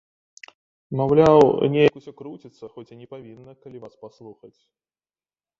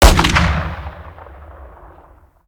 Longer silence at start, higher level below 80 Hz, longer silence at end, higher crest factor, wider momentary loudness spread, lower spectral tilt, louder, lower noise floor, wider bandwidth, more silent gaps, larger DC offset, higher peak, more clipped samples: first, 0.9 s vs 0 s; second, -56 dBFS vs -20 dBFS; first, 1.3 s vs 0.8 s; about the same, 20 dB vs 16 dB; about the same, 27 LU vs 26 LU; first, -7.5 dB/octave vs -4 dB/octave; about the same, -17 LUFS vs -15 LUFS; first, under -90 dBFS vs -46 dBFS; second, 7.4 kHz vs over 20 kHz; neither; neither; about the same, -2 dBFS vs 0 dBFS; neither